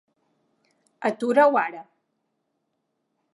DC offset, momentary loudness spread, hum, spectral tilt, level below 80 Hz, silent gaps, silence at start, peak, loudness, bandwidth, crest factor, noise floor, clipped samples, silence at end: under 0.1%; 13 LU; none; -5.5 dB/octave; -86 dBFS; none; 1 s; -6 dBFS; -22 LUFS; 11.5 kHz; 22 dB; -77 dBFS; under 0.1%; 1.5 s